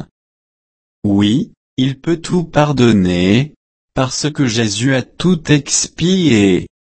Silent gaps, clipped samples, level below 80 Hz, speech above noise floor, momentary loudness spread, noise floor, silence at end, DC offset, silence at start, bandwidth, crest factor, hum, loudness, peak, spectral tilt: 0.11-1.02 s, 1.57-1.77 s, 3.56-3.89 s; under 0.1%; -42 dBFS; over 76 dB; 8 LU; under -90 dBFS; 0.3 s; under 0.1%; 0 s; 8.8 kHz; 14 dB; none; -15 LUFS; 0 dBFS; -5 dB/octave